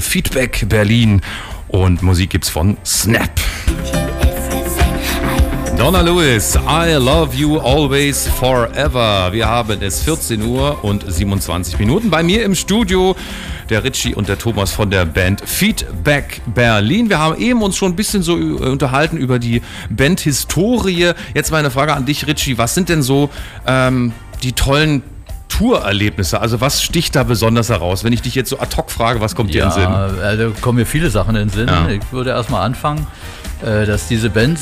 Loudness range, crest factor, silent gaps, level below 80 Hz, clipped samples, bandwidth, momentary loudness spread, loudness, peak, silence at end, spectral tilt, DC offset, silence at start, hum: 3 LU; 12 dB; none; -24 dBFS; under 0.1%; 16 kHz; 6 LU; -15 LUFS; -4 dBFS; 0 s; -4.5 dB/octave; under 0.1%; 0 s; none